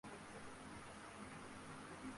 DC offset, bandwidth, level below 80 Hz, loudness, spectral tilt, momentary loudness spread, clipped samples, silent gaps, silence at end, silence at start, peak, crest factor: under 0.1%; 11.5 kHz; -72 dBFS; -54 LUFS; -4 dB/octave; 1 LU; under 0.1%; none; 0 s; 0.05 s; -40 dBFS; 14 dB